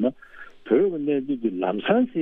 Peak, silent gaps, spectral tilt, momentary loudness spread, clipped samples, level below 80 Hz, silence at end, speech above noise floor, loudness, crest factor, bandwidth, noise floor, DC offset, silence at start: -6 dBFS; none; -9 dB/octave; 11 LU; under 0.1%; -62 dBFS; 0 s; 21 dB; -24 LUFS; 18 dB; 3.9 kHz; -44 dBFS; under 0.1%; 0 s